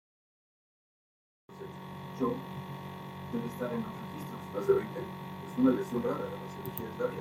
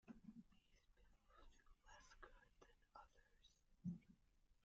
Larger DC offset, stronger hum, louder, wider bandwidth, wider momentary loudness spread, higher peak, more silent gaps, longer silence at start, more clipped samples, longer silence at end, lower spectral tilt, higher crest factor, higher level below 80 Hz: neither; neither; first, -35 LUFS vs -61 LUFS; first, 16 kHz vs 7.4 kHz; about the same, 15 LU vs 13 LU; first, -14 dBFS vs -40 dBFS; neither; first, 1.5 s vs 0.05 s; neither; about the same, 0 s vs 0 s; about the same, -7.5 dB/octave vs -6.5 dB/octave; about the same, 22 dB vs 22 dB; about the same, -70 dBFS vs -74 dBFS